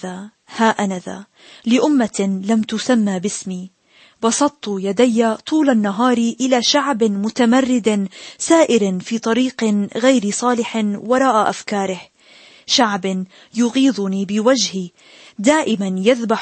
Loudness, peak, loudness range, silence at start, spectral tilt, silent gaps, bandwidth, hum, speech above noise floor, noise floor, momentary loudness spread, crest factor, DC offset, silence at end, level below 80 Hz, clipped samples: -17 LUFS; -2 dBFS; 3 LU; 0.05 s; -4 dB/octave; none; 8.8 kHz; none; 29 dB; -46 dBFS; 12 LU; 16 dB; under 0.1%; 0 s; -64 dBFS; under 0.1%